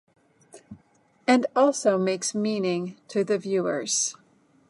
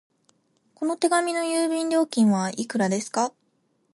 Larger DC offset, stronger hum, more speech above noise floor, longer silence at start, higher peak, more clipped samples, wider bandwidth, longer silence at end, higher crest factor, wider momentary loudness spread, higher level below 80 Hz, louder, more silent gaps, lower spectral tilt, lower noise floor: neither; neither; second, 38 dB vs 46 dB; second, 0.55 s vs 0.8 s; about the same, -8 dBFS vs -8 dBFS; neither; about the same, 11.5 kHz vs 11.5 kHz; about the same, 0.6 s vs 0.65 s; about the same, 18 dB vs 18 dB; about the same, 8 LU vs 7 LU; about the same, -74 dBFS vs -74 dBFS; about the same, -25 LUFS vs -24 LUFS; neither; about the same, -4 dB/octave vs -4.5 dB/octave; second, -62 dBFS vs -69 dBFS